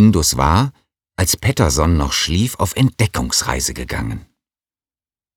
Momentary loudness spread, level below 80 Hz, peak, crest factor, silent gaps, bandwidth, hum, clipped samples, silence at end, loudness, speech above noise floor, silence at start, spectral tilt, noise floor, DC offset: 9 LU; -30 dBFS; 0 dBFS; 18 dB; none; 20 kHz; none; under 0.1%; 1.15 s; -17 LUFS; over 74 dB; 0 s; -4.5 dB/octave; under -90 dBFS; under 0.1%